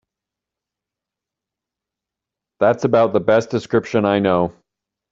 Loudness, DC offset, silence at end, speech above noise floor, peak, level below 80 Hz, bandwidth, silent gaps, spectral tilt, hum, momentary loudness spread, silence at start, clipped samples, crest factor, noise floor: -18 LUFS; under 0.1%; 0.6 s; 69 dB; -2 dBFS; -56 dBFS; 7.8 kHz; none; -7 dB/octave; none; 5 LU; 2.6 s; under 0.1%; 18 dB; -86 dBFS